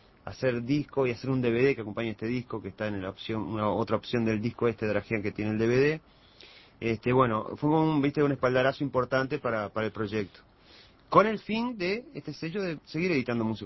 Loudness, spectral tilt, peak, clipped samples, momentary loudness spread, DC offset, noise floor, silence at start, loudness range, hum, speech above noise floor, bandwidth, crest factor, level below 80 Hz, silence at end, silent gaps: -29 LUFS; -7.5 dB/octave; -6 dBFS; under 0.1%; 10 LU; under 0.1%; -56 dBFS; 0.25 s; 3 LU; none; 28 dB; 6 kHz; 22 dB; -56 dBFS; 0 s; none